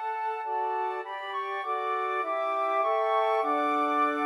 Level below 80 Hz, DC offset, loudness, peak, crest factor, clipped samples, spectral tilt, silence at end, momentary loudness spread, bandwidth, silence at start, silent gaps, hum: under -90 dBFS; under 0.1%; -28 LUFS; -14 dBFS; 14 dB; under 0.1%; -2.5 dB/octave; 0 s; 7 LU; 12.5 kHz; 0 s; none; none